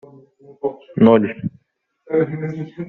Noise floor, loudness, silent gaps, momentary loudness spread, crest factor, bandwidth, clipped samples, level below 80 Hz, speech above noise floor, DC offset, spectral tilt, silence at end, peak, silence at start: -66 dBFS; -19 LUFS; none; 15 LU; 18 dB; 4.1 kHz; under 0.1%; -58 dBFS; 49 dB; under 0.1%; -7.5 dB/octave; 0 s; -2 dBFS; 0.65 s